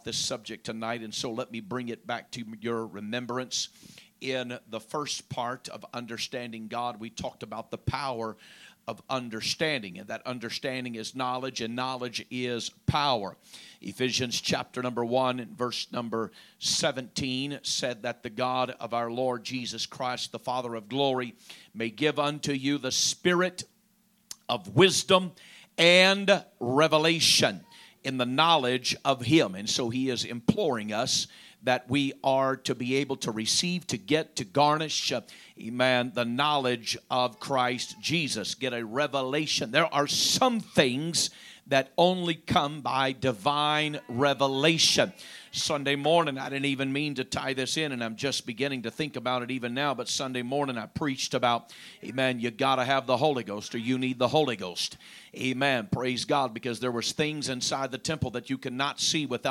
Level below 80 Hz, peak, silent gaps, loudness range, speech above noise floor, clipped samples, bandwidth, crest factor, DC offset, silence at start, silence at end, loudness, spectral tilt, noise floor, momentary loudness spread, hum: -62 dBFS; -6 dBFS; none; 10 LU; 38 dB; under 0.1%; 16.5 kHz; 24 dB; under 0.1%; 0.05 s; 0 s; -28 LUFS; -3.5 dB/octave; -67 dBFS; 12 LU; none